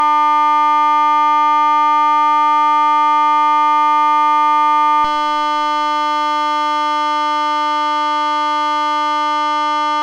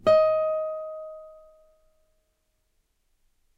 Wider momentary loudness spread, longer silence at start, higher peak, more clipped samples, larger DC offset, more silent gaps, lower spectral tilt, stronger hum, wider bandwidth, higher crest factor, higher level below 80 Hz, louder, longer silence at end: second, 4 LU vs 22 LU; about the same, 0 s vs 0.05 s; first, -6 dBFS vs -10 dBFS; neither; neither; neither; second, -1.5 dB/octave vs -5.5 dB/octave; first, 50 Hz at -55 dBFS vs none; first, 10 kHz vs 7.4 kHz; second, 8 dB vs 18 dB; first, -52 dBFS vs -62 dBFS; first, -14 LUFS vs -25 LUFS; second, 0 s vs 2.25 s